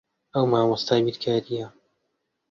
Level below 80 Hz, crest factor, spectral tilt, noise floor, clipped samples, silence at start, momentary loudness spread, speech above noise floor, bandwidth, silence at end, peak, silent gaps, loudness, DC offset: -64 dBFS; 18 dB; -6.5 dB/octave; -77 dBFS; under 0.1%; 0.35 s; 12 LU; 54 dB; 7.4 kHz; 0.8 s; -6 dBFS; none; -24 LUFS; under 0.1%